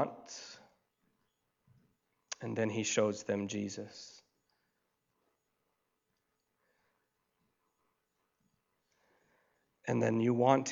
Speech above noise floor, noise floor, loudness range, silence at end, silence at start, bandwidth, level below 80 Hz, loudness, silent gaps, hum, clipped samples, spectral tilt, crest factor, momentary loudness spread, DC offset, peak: 50 dB; -83 dBFS; 10 LU; 0 s; 0 s; 7.8 kHz; -86 dBFS; -34 LUFS; none; none; under 0.1%; -5 dB/octave; 28 dB; 19 LU; under 0.1%; -12 dBFS